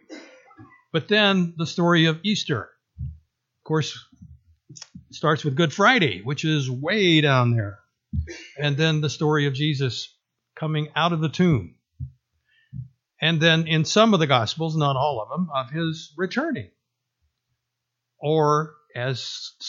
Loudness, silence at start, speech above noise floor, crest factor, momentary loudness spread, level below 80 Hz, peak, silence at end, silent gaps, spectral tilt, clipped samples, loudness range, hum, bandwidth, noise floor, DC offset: -22 LUFS; 0.1 s; 59 dB; 22 dB; 22 LU; -50 dBFS; -2 dBFS; 0 s; none; -5.5 dB/octave; under 0.1%; 7 LU; none; 7.6 kHz; -81 dBFS; under 0.1%